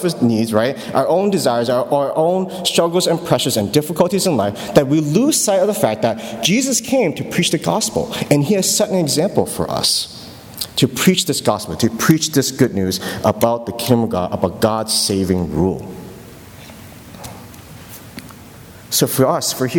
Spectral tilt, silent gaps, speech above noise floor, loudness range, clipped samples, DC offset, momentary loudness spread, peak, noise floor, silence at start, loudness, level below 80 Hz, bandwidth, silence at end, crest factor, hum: -4.5 dB/octave; none; 22 dB; 6 LU; under 0.1%; under 0.1%; 19 LU; 0 dBFS; -38 dBFS; 0 s; -16 LUFS; -48 dBFS; 19.5 kHz; 0 s; 18 dB; none